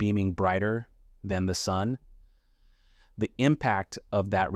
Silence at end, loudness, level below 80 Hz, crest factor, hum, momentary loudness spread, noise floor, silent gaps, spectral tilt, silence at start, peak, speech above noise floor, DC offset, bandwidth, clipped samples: 0 s; -29 LUFS; -54 dBFS; 20 dB; none; 9 LU; -63 dBFS; none; -6 dB/octave; 0 s; -10 dBFS; 35 dB; under 0.1%; 14 kHz; under 0.1%